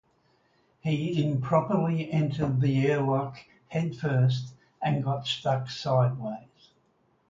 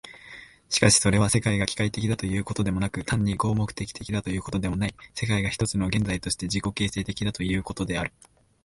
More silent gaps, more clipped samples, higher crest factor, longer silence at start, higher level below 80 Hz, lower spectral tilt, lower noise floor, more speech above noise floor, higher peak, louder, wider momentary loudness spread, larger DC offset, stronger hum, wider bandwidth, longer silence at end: neither; neither; about the same, 18 dB vs 22 dB; first, 0.85 s vs 0.05 s; second, -62 dBFS vs -44 dBFS; first, -7.5 dB/octave vs -4.5 dB/octave; first, -68 dBFS vs -47 dBFS; first, 42 dB vs 21 dB; second, -10 dBFS vs -4 dBFS; about the same, -28 LUFS vs -26 LUFS; about the same, 10 LU vs 10 LU; neither; neither; second, 7.6 kHz vs 11.5 kHz; first, 0.85 s vs 0.55 s